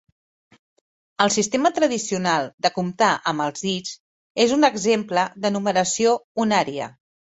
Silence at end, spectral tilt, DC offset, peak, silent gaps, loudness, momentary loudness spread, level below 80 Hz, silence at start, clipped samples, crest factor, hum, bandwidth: 0.45 s; -3.5 dB/octave; under 0.1%; -2 dBFS; 2.54-2.58 s, 4.00-4.35 s, 6.24-6.35 s; -21 LUFS; 10 LU; -64 dBFS; 1.2 s; under 0.1%; 20 dB; none; 8.4 kHz